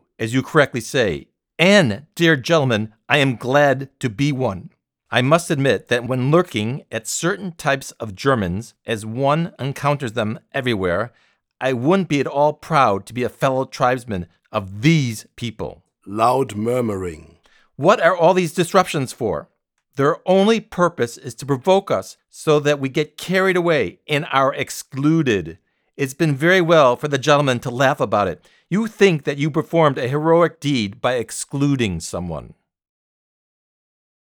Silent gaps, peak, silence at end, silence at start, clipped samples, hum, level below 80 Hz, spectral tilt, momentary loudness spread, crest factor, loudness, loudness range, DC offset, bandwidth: none; 0 dBFS; 1.85 s; 0.2 s; under 0.1%; none; -54 dBFS; -5.5 dB/octave; 11 LU; 20 dB; -19 LUFS; 5 LU; under 0.1%; 19.5 kHz